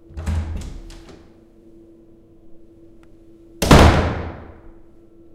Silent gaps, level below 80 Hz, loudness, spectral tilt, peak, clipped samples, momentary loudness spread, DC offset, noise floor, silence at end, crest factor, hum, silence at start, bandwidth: none; -26 dBFS; -16 LUFS; -5.5 dB/octave; 0 dBFS; under 0.1%; 28 LU; under 0.1%; -47 dBFS; 0.65 s; 20 dB; none; 0.15 s; 16 kHz